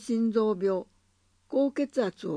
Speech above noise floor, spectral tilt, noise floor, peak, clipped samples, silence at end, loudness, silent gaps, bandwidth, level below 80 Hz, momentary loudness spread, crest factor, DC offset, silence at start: 41 dB; -7 dB/octave; -68 dBFS; -14 dBFS; under 0.1%; 0 s; -28 LUFS; none; 10.5 kHz; -70 dBFS; 5 LU; 14 dB; under 0.1%; 0 s